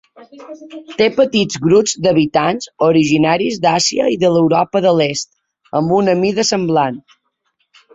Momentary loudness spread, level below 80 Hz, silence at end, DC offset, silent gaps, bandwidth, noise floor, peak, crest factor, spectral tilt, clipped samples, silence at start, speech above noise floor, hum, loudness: 13 LU; -54 dBFS; 0.95 s; under 0.1%; none; 8 kHz; -66 dBFS; -2 dBFS; 14 dB; -4.5 dB/octave; under 0.1%; 0.35 s; 52 dB; none; -14 LUFS